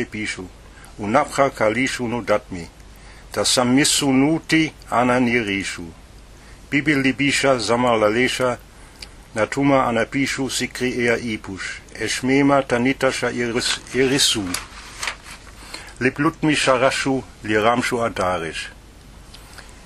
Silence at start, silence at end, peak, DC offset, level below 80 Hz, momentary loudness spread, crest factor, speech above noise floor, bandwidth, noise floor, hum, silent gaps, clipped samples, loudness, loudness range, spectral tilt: 0 s; 0 s; 0 dBFS; under 0.1%; -46 dBFS; 17 LU; 20 dB; 23 dB; 15 kHz; -43 dBFS; none; none; under 0.1%; -19 LUFS; 3 LU; -3.5 dB/octave